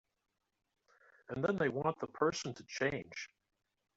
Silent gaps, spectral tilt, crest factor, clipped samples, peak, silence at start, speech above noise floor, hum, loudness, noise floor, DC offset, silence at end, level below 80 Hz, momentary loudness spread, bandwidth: none; -4.5 dB/octave; 22 dB; under 0.1%; -18 dBFS; 1.3 s; 31 dB; none; -37 LUFS; -68 dBFS; under 0.1%; 0.7 s; -72 dBFS; 13 LU; 8 kHz